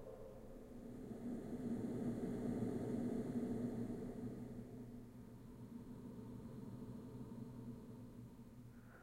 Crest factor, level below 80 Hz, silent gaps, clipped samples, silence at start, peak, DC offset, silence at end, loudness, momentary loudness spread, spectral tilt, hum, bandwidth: 16 dB; -64 dBFS; none; under 0.1%; 0 s; -32 dBFS; under 0.1%; 0 s; -48 LUFS; 14 LU; -8.5 dB/octave; none; 16 kHz